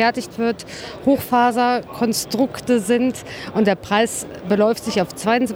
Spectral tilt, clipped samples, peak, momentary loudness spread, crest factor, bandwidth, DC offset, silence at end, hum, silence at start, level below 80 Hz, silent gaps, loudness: -4.5 dB/octave; under 0.1%; -4 dBFS; 6 LU; 14 dB; over 20 kHz; under 0.1%; 0 s; none; 0 s; -52 dBFS; none; -20 LUFS